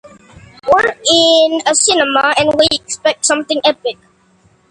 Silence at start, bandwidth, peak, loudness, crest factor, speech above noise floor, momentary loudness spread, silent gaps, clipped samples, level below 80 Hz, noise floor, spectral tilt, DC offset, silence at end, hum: 0.65 s; 11.5 kHz; 0 dBFS; -12 LUFS; 14 dB; 39 dB; 7 LU; none; under 0.1%; -50 dBFS; -52 dBFS; -1 dB/octave; under 0.1%; 0.75 s; none